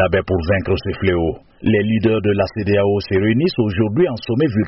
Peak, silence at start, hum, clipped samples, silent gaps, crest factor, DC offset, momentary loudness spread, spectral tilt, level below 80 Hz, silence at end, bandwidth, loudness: -4 dBFS; 0 s; none; under 0.1%; none; 12 dB; under 0.1%; 3 LU; -6 dB/octave; -38 dBFS; 0 s; 6 kHz; -18 LUFS